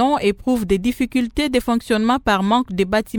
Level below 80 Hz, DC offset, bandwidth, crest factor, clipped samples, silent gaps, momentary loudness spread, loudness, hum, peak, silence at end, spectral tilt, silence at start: -38 dBFS; under 0.1%; 18.5 kHz; 14 dB; under 0.1%; none; 3 LU; -19 LUFS; none; -4 dBFS; 0 s; -5.5 dB/octave; 0 s